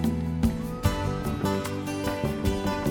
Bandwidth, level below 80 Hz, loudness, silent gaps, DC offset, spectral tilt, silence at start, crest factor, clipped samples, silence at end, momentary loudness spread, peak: 17.5 kHz; -38 dBFS; -28 LUFS; none; under 0.1%; -6.5 dB/octave; 0 s; 18 dB; under 0.1%; 0 s; 3 LU; -10 dBFS